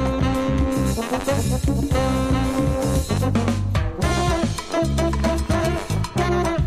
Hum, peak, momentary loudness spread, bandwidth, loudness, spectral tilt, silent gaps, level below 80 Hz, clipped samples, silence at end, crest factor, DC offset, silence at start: none; -6 dBFS; 3 LU; 15.5 kHz; -22 LUFS; -6 dB/octave; none; -28 dBFS; under 0.1%; 0 s; 14 dB; under 0.1%; 0 s